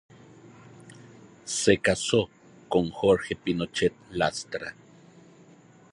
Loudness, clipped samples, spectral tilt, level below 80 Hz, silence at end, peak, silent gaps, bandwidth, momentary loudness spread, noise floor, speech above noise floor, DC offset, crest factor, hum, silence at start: -26 LUFS; under 0.1%; -4 dB/octave; -54 dBFS; 1.2 s; -6 dBFS; none; 11.5 kHz; 13 LU; -54 dBFS; 29 dB; under 0.1%; 22 dB; none; 0.45 s